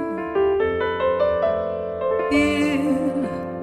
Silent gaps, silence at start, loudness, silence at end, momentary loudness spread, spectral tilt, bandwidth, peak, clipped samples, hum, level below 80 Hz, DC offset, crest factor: none; 0 s; -21 LUFS; 0 s; 6 LU; -6 dB/octave; 13.5 kHz; -8 dBFS; under 0.1%; none; -46 dBFS; under 0.1%; 14 dB